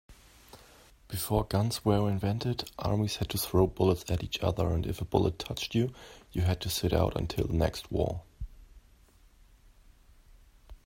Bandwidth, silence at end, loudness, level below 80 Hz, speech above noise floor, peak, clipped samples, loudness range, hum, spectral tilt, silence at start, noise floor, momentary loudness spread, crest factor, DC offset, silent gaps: 16.5 kHz; 0.1 s; -31 LUFS; -46 dBFS; 30 dB; -8 dBFS; under 0.1%; 5 LU; none; -6 dB/octave; 0.1 s; -60 dBFS; 8 LU; 22 dB; under 0.1%; none